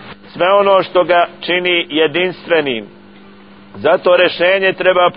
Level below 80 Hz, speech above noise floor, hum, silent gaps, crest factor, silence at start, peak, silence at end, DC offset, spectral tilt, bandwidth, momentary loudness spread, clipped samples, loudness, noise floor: -56 dBFS; 27 dB; none; none; 14 dB; 0 s; 0 dBFS; 0 s; 0.3%; -8 dB/octave; 5.4 kHz; 7 LU; under 0.1%; -13 LUFS; -40 dBFS